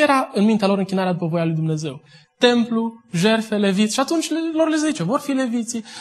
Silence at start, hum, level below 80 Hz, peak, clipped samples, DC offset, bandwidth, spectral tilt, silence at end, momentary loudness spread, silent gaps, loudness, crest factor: 0 s; none; -68 dBFS; -2 dBFS; under 0.1%; under 0.1%; 12.5 kHz; -5 dB/octave; 0 s; 7 LU; none; -20 LUFS; 18 dB